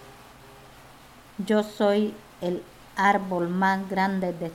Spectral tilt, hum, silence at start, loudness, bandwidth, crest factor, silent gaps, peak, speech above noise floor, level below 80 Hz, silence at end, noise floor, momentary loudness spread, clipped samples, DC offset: -6.5 dB/octave; none; 0 s; -26 LUFS; 16 kHz; 18 dB; none; -8 dBFS; 25 dB; -60 dBFS; 0 s; -50 dBFS; 12 LU; under 0.1%; under 0.1%